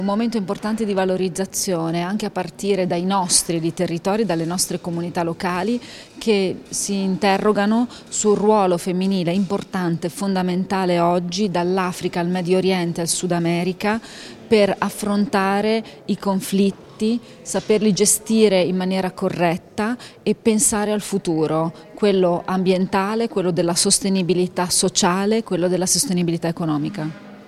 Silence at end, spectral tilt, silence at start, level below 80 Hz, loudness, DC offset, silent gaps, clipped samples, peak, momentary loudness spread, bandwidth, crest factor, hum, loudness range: 0.05 s; -4.5 dB/octave; 0 s; -54 dBFS; -20 LUFS; under 0.1%; none; under 0.1%; 0 dBFS; 8 LU; 15 kHz; 18 dB; none; 3 LU